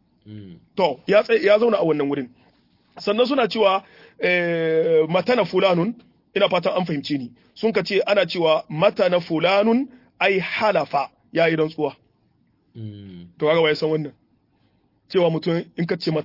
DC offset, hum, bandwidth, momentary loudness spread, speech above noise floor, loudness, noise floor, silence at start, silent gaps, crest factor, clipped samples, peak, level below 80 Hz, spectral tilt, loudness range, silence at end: under 0.1%; none; 5.8 kHz; 12 LU; 43 dB; -20 LUFS; -63 dBFS; 0.25 s; none; 18 dB; under 0.1%; -4 dBFS; -68 dBFS; -7 dB/octave; 4 LU; 0 s